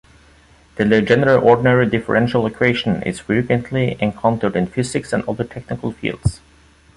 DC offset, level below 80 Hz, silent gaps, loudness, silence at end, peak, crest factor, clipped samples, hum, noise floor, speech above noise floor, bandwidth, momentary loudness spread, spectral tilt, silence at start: under 0.1%; -42 dBFS; none; -18 LUFS; 0.6 s; -2 dBFS; 16 dB; under 0.1%; none; -49 dBFS; 32 dB; 11.5 kHz; 11 LU; -6.5 dB/octave; 0.75 s